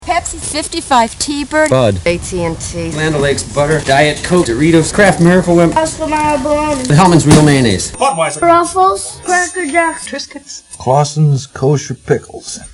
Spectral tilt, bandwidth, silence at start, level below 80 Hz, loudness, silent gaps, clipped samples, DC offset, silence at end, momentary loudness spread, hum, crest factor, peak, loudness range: -5 dB/octave; 11.5 kHz; 0 s; -34 dBFS; -12 LUFS; none; 0.5%; under 0.1%; 0.05 s; 10 LU; none; 12 dB; 0 dBFS; 5 LU